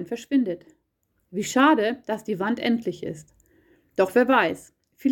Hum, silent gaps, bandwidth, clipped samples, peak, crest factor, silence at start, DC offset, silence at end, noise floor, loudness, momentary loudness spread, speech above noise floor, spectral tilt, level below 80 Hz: none; none; 17 kHz; under 0.1%; -6 dBFS; 18 dB; 0 s; under 0.1%; 0 s; -72 dBFS; -23 LUFS; 17 LU; 49 dB; -4.5 dB/octave; -66 dBFS